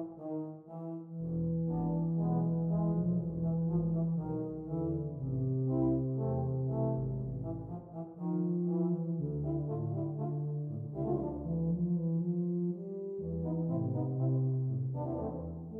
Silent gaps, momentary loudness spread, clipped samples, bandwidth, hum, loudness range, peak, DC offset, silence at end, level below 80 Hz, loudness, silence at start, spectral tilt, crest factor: none; 9 LU; under 0.1%; 1.6 kHz; none; 2 LU; -22 dBFS; under 0.1%; 0 s; -54 dBFS; -35 LUFS; 0 s; -14.5 dB/octave; 12 dB